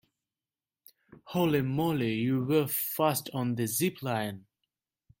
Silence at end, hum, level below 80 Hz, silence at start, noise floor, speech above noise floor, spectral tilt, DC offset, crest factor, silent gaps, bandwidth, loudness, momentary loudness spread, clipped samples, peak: 0.8 s; none; -68 dBFS; 1.25 s; under -90 dBFS; over 61 dB; -5.5 dB/octave; under 0.1%; 18 dB; none; 17 kHz; -29 LUFS; 6 LU; under 0.1%; -12 dBFS